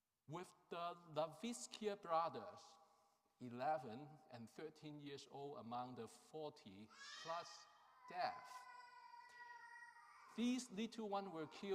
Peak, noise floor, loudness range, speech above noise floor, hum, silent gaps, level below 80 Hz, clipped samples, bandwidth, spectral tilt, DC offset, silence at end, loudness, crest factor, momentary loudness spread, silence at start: -30 dBFS; -79 dBFS; 6 LU; 30 dB; none; none; under -90 dBFS; under 0.1%; 15.5 kHz; -4.5 dB/octave; under 0.1%; 0 s; -50 LUFS; 22 dB; 17 LU; 0.3 s